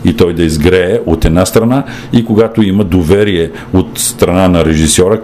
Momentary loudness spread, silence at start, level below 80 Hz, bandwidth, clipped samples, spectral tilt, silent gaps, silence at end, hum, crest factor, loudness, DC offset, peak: 5 LU; 0 s; -24 dBFS; 16 kHz; 0.4%; -5.5 dB/octave; none; 0 s; none; 10 dB; -10 LUFS; 0.2%; 0 dBFS